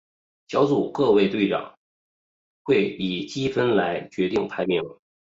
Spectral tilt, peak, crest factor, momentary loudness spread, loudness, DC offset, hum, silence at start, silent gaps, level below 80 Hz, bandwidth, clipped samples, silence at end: -6.5 dB/octave; -8 dBFS; 16 dB; 8 LU; -23 LUFS; under 0.1%; none; 0.5 s; 1.77-2.65 s; -60 dBFS; 7.6 kHz; under 0.1%; 0.45 s